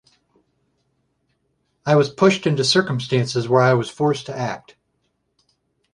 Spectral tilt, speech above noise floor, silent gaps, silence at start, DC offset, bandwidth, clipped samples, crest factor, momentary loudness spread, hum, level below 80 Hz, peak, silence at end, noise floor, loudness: -5.5 dB/octave; 52 dB; none; 1.85 s; under 0.1%; 11.5 kHz; under 0.1%; 20 dB; 11 LU; none; -62 dBFS; -2 dBFS; 1.35 s; -70 dBFS; -19 LUFS